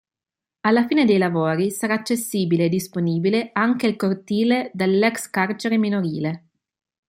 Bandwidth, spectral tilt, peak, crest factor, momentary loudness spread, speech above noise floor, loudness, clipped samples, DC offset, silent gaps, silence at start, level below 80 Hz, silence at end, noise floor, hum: 16 kHz; -5.5 dB/octave; -4 dBFS; 16 dB; 6 LU; 69 dB; -21 LUFS; under 0.1%; under 0.1%; none; 0.65 s; -66 dBFS; 0.7 s; -89 dBFS; none